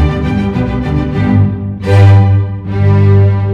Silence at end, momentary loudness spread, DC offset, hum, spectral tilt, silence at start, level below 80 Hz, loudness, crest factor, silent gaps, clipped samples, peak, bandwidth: 0 s; 8 LU; under 0.1%; none; -9 dB/octave; 0 s; -24 dBFS; -10 LUFS; 8 dB; none; 0.6%; 0 dBFS; 5.2 kHz